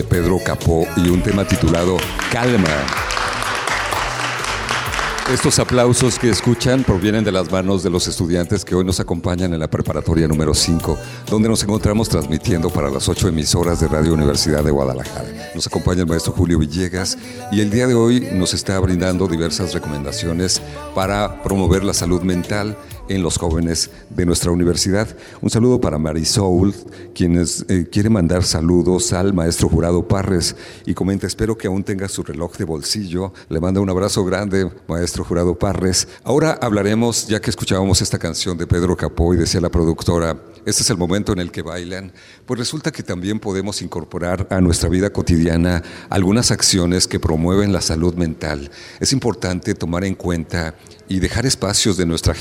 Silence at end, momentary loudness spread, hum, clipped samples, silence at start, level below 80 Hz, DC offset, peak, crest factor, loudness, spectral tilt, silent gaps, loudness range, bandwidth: 0 s; 8 LU; none; under 0.1%; 0 s; -32 dBFS; under 0.1%; -2 dBFS; 16 dB; -18 LUFS; -5 dB/octave; none; 4 LU; 19 kHz